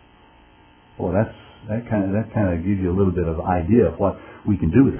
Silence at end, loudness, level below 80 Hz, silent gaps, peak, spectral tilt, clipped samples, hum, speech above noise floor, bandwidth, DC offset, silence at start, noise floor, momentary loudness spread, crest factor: 0 s; -21 LUFS; -36 dBFS; none; -2 dBFS; -13 dB/octave; under 0.1%; none; 31 dB; 3.4 kHz; under 0.1%; 1 s; -51 dBFS; 12 LU; 18 dB